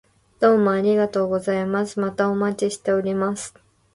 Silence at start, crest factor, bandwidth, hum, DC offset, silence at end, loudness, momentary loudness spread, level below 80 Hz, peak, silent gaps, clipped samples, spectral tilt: 0.4 s; 16 dB; 11.5 kHz; none; under 0.1%; 0.45 s; -21 LUFS; 7 LU; -60 dBFS; -6 dBFS; none; under 0.1%; -6 dB/octave